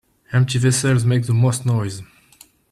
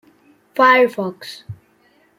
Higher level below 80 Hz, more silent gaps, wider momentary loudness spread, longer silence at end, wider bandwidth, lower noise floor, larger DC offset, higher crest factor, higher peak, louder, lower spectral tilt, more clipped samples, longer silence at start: first, -52 dBFS vs -64 dBFS; neither; second, 7 LU vs 22 LU; about the same, 0.7 s vs 0.65 s; second, 13 kHz vs 15.5 kHz; second, -51 dBFS vs -57 dBFS; neither; second, 12 dB vs 18 dB; second, -6 dBFS vs -2 dBFS; second, -18 LUFS vs -15 LUFS; about the same, -5.5 dB/octave vs -5 dB/octave; neither; second, 0.3 s vs 0.55 s